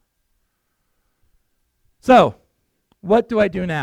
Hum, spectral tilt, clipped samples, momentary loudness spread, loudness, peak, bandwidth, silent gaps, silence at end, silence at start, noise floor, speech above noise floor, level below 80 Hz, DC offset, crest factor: none; -6.5 dB/octave; under 0.1%; 13 LU; -16 LUFS; -2 dBFS; 14 kHz; none; 0 s; 2.05 s; -70 dBFS; 55 dB; -50 dBFS; under 0.1%; 20 dB